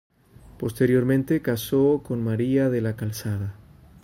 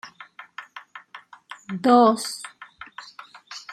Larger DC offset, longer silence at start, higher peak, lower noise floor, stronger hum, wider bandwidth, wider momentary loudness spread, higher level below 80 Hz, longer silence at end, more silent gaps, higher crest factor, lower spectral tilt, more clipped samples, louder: neither; first, 0.45 s vs 0.05 s; second, -8 dBFS vs -4 dBFS; about the same, -50 dBFS vs -47 dBFS; neither; first, 16 kHz vs 13.5 kHz; second, 10 LU vs 27 LU; first, -52 dBFS vs -76 dBFS; first, 0.5 s vs 0.15 s; neither; second, 16 dB vs 22 dB; first, -7 dB/octave vs -4.5 dB/octave; neither; second, -24 LUFS vs -20 LUFS